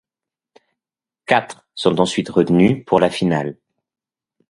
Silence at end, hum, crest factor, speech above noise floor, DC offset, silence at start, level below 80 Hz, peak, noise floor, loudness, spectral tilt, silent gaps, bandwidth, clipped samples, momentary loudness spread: 0.95 s; none; 20 dB; 73 dB; under 0.1%; 1.3 s; -54 dBFS; 0 dBFS; -89 dBFS; -17 LUFS; -6 dB/octave; none; 11.5 kHz; under 0.1%; 11 LU